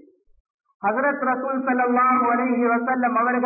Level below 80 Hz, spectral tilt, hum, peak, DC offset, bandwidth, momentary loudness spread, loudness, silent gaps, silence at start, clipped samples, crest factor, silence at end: -72 dBFS; -13 dB/octave; none; -12 dBFS; under 0.1%; 2.7 kHz; 6 LU; -21 LUFS; none; 0.85 s; under 0.1%; 10 dB; 0 s